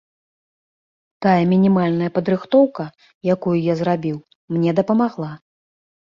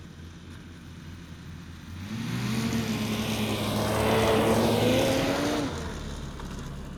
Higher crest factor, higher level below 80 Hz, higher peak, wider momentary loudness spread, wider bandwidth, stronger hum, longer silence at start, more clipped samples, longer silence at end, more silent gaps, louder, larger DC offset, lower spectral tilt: about the same, 18 dB vs 18 dB; second, -60 dBFS vs -44 dBFS; first, -2 dBFS vs -10 dBFS; second, 14 LU vs 21 LU; second, 7 kHz vs over 20 kHz; neither; first, 1.2 s vs 0 s; neither; first, 0.75 s vs 0 s; first, 3.14-3.21 s, 4.35-4.48 s vs none; first, -19 LUFS vs -27 LUFS; neither; first, -9 dB/octave vs -5 dB/octave